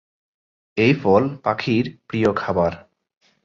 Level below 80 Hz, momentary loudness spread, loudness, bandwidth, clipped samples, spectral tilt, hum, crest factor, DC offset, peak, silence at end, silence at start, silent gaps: -50 dBFS; 8 LU; -20 LUFS; 7.4 kHz; under 0.1%; -7.5 dB/octave; none; 18 dB; under 0.1%; -2 dBFS; 0.65 s; 0.75 s; none